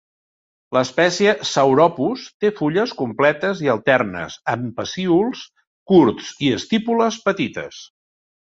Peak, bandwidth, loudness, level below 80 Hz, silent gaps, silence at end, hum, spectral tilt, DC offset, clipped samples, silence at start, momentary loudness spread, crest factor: -2 dBFS; 8 kHz; -19 LUFS; -58 dBFS; 2.34-2.40 s, 5.67-5.86 s; 0.6 s; none; -5 dB/octave; under 0.1%; under 0.1%; 0.7 s; 10 LU; 18 dB